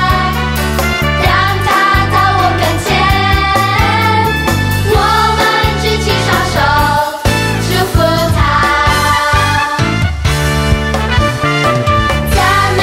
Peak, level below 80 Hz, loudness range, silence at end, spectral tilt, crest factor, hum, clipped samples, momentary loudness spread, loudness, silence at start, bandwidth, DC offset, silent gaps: 0 dBFS; -20 dBFS; 1 LU; 0 s; -4.5 dB/octave; 12 dB; none; under 0.1%; 3 LU; -11 LUFS; 0 s; 16.5 kHz; under 0.1%; none